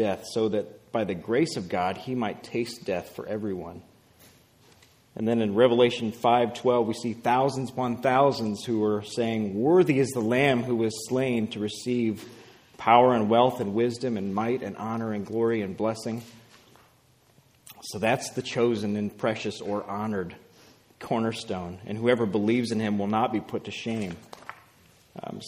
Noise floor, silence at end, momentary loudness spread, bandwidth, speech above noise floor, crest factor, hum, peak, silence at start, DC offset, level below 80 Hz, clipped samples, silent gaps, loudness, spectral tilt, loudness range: -61 dBFS; 0 s; 13 LU; 15.5 kHz; 35 dB; 22 dB; none; -4 dBFS; 0 s; under 0.1%; -66 dBFS; under 0.1%; none; -26 LUFS; -6 dB/octave; 7 LU